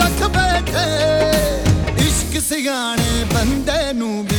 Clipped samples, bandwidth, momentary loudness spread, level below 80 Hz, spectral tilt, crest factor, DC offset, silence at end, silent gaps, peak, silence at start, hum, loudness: under 0.1%; over 20 kHz; 3 LU; -26 dBFS; -4.5 dB/octave; 16 dB; under 0.1%; 0 s; none; -2 dBFS; 0 s; none; -17 LUFS